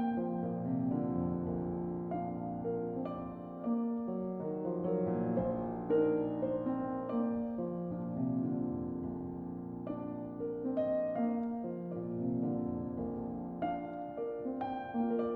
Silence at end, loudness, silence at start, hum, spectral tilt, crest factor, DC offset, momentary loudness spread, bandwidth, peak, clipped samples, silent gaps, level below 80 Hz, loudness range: 0 s; -37 LUFS; 0 s; none; -12 dB/octave; 16 dB; under 0.1%; 7 LU; 4 kHz; -20 dBFS; under 0.1%; none; -62 dBFS; 3 LU